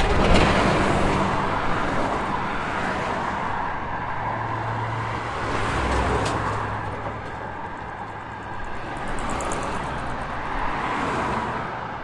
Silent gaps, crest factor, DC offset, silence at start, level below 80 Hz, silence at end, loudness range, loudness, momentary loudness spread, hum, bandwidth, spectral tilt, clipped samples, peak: none; 20 dB; under 0.1%; 0 s; -34 dBFS; 0 s; 7 LU; -25 LUFS; 12 LU; none; 11.5 kHz; -5.5 dB/octave; under 0.1%; -4 dBFS